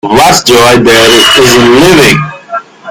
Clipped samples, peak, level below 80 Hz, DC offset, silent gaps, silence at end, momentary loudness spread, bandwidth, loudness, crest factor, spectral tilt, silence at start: 10%; 0 dBFS; -32 dBFS; under 0.1%; none; 0 s; 15 LU; over 20 kHz; -3 LUFS; 4 dB; -3.5 dB/octave; 0.05 s